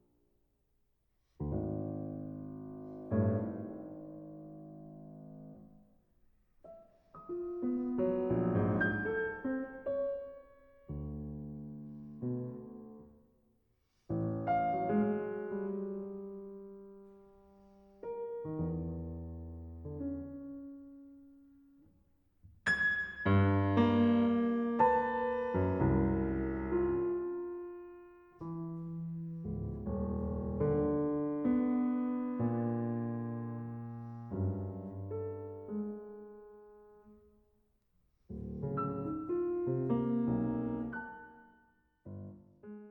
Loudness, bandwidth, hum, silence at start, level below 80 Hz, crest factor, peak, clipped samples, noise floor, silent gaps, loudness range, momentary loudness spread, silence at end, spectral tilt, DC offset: -35 LUFS; 7.4 kHz; none; 1.4 s; -54 dBFS; 20 dB; -16 dBFS; under 0.1%; -76 dBFS; none; 14 LU; 21 LU; 0 s; -9 dB/octave; under 0.1%